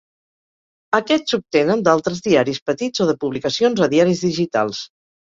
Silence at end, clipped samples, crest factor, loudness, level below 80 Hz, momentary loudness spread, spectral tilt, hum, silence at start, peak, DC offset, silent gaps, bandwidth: 0.45 s; under 0.1%; 18 dB; -18 LUFS; -58 dBFS; 6 LU; -5 dB/octave; none; 0.9 s; 0 dBFS; under 0.1%; 2.62-2.66 s; 7.8 kHz